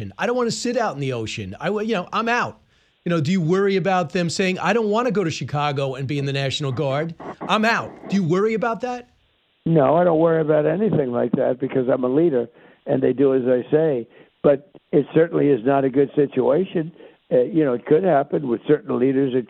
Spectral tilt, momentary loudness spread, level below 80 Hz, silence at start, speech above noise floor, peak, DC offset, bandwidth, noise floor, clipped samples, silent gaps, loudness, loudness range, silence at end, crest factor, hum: -6.5 dB/octave; 8 LU; -60 dBFS; 0 s; 43 dB; -4 dBFS; under 0.1%; 9.8 kHz; -63 dBFS; under 0.1%; none; -20 LUFS; 3 LU; 0.05 s; 16 dB; none